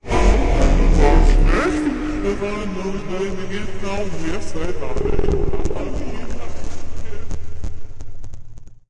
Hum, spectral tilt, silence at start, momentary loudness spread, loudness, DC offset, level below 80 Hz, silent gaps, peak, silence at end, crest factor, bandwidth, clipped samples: none; -6.5 dB/octave; 0.05 s; 18 LU; -21 LUFS; under 0.1%; -20 dBFS; none; -2 dBFS; 0.15 s; 14 dB; 9.4 kHz; under 0.1%